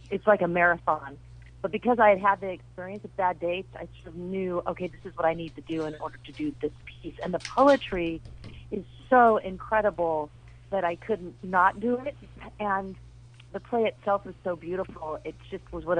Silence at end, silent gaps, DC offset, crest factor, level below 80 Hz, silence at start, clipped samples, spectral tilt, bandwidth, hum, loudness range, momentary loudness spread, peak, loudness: 0 s; none; under 0.1%; 20 dB; -52 dBFS; 0.05 s; under 0.1%; -6.5 dB/octave; 10 kHz; none; 7 LU; 19 LU; -8 dBFS; -27 LUFS